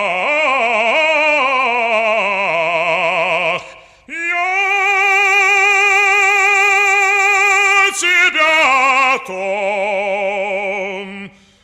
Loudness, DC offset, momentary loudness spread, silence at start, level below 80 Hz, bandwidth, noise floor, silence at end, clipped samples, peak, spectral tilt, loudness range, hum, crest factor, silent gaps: -12 LUFS; under 0.1%; 9 LU; 0 s; -58 dBFS; 15.5 kHz; -38 dBFS; 0.35 s; under 0.1%; -2 dBFS; -1 dB/octave; 5 LU; none; 12 dB; none